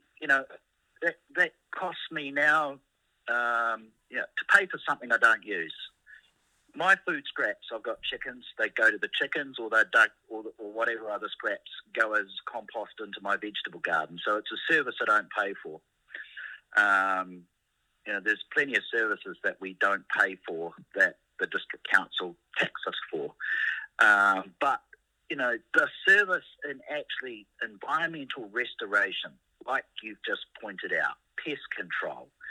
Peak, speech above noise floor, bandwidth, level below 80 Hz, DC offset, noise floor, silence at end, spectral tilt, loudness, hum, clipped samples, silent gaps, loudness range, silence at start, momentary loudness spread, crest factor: -6 dBFS; 47 dB; 13 kHz; -78 dBFS; under 0.1%; -76 dBFS; 0 s; -3 dB/octave; -28 LUFS; none; under 0.1%; none; 5 LU; 0.2 s; 16 LU; 24 dB